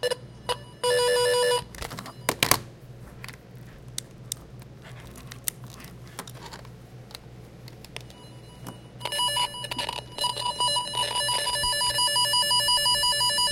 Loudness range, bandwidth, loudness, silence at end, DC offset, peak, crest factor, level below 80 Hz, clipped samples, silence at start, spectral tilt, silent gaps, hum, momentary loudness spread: 17 LU; 17 kHz; -24 LUFS; 0 s; under 0.1%; 0 dBFS; 28 dB; -52 dBFS; under 0.1%; 0 s; -1 dB/octave; none; none; 25 LU